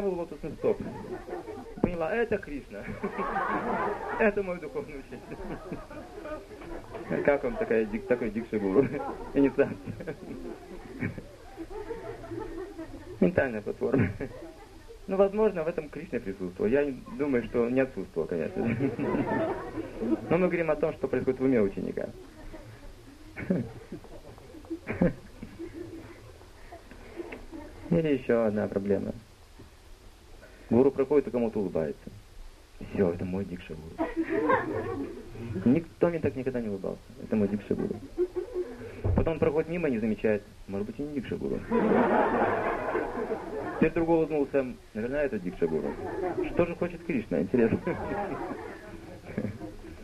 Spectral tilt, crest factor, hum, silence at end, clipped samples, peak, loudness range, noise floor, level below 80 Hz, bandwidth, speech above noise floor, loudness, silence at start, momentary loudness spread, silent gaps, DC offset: -8 dB/octave; 22 dB; none; 0 s; under 0.1%; -8 dBFS; 7 LU; -51 dBFS; -48 dBFS; 13.5 kHz; 22 dB; -30 LUFS; 0 s; 17 LU; none; under 0.1%